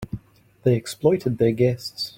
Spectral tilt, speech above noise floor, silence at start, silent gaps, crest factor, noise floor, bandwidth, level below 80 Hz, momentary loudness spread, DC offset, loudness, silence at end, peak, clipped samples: -6.5 dB/octave; 19 dB; 0 s; none; 18 dB; -40 dBFS; 16.5 kHz; -52 dBFS; 12 LU; under 0.1%; -22 LUFS; 0.1 s; -6 dBFS; under 0.1%